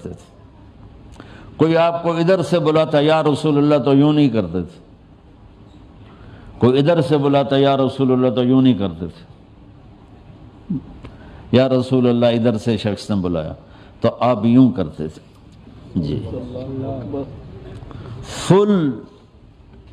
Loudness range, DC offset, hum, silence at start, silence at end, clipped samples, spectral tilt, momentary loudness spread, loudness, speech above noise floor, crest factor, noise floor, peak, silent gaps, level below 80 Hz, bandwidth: 6 LU; under 0.1%; none; 0 s; 0.85 s; under 0.1%; -7.5 dB/octave; 19 LU; -17 LUFS; 29 dB; 18 dB; -46 dBFS; 0 dBFS; none; -48 dBFS; 10.5 kHz